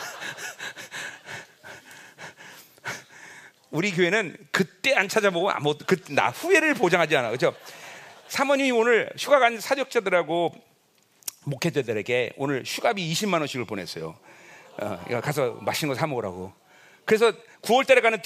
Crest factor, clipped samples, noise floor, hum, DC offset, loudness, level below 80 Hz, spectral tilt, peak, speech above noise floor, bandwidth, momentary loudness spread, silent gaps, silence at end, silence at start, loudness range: 22 dB; under 0.1%; -63 dBFS; none; under 0.1%; -24 LUFS; -74 dBFS; -4 dB/octave; -4 dBFS; 39 dB; 15.5 kHz; 21 LU; none; 0 s; 0 s; 8 LU